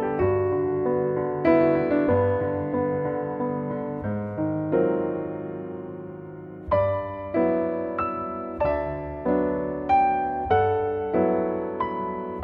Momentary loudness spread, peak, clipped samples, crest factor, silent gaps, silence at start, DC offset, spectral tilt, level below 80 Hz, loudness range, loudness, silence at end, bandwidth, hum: 10 LU; -8 dBFS; under 0.1%; 16 dB; none; 0 s; under 0.1%; -10.5 dB/octave; -48 dBFS; 4 LU; -25 LUFS; 0 s; 5.2 kHz; none